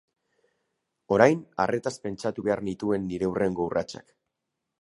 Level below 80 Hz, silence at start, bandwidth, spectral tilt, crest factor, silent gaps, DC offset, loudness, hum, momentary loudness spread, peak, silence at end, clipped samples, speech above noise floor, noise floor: -58 dBFS; 1.1 s; 11.5 kHz; -6 dB/octave; 26 dB; none; under 0.1%; -26 LUFS; none; 11 LU; -2 dBFS; 0.8 s; under 0.1%; 57 dB; -83 dBFS